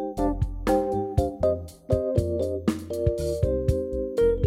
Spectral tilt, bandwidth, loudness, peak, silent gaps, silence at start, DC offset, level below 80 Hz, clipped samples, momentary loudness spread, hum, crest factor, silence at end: -8 dB/octave; 16 kHz; -26 LUFS; -8 dBFS; none; 0 s; under 0.1%; -34 dBFS; under 0.1%; 4 LU; none; 16 dB; 0 s